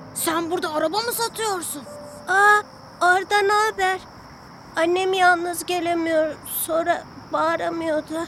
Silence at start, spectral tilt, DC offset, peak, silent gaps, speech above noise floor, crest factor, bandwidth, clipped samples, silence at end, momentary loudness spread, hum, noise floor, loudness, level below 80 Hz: 0 s; -2.5 dB/octave; under 0.1%; -4 dBFS; none; 21 dB; 18 dB; 16.5 kHz; under 0.1%; 0 s; 11 LU; none; -43 dBFS; -21 LUFS; -58 dBFS